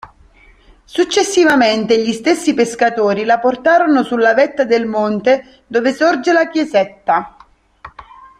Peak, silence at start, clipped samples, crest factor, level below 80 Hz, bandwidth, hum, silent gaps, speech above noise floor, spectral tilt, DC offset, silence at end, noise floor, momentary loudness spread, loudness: 0 dBFS; 0.05 s; under 0.1%; 14 dB; -54 dBFS; 14.5 kHz; none; none; 33 dB; -4 dB/octave; under 0.1%; 0.4 s; -46 dBFS; 6 LU; -14 LUFS